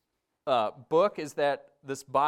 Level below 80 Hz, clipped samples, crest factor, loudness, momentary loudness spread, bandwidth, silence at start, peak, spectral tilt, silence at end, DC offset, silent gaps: -74 dBFS; under 0.1%; 16 dB; -29 LUFS; 13 LU; 15.5 kHz; 0.45 s; -12 dBFS; -4.5 dB/octave; 0 s; under 0.1%; none